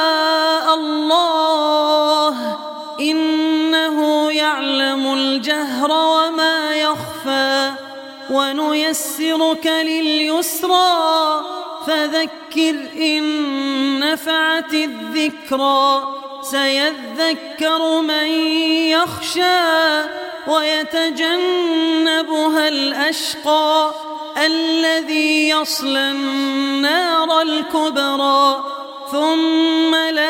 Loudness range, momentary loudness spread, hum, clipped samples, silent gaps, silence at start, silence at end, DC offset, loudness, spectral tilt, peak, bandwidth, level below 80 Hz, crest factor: 2 LU; 6 LU; none; under 0.1%; none; 0 s; 0 s; under 0.1%; -16 LUFS; -2 dB/octave; -2 dBFS; 17 kHz; -66 dBFS; 16 dB